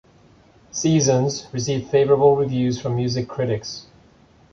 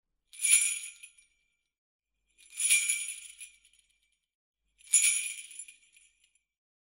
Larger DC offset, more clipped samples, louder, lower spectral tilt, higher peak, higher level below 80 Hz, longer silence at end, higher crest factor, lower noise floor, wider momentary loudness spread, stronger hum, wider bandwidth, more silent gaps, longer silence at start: neither; neither; first, -20 LUFS vs -26 LUFS; first, -5.5 dB/octave vs 8 dB/octave; first, -4 dBFS vs -8 dBFS; first, -52 dBFS vs -84 dBFS; second, 0.7 s vs 1.1 s; second, 18 dB vs 26 dB; second, -53 dBFS vs -78 dBFS; second, 11 LU vs 23 LU; neither; second, 7.4 kHz vs 16 kHz; second, none vs 1.78-1.99 s, 4.35-4.54 s; first, 0.75 s vs 0.35 s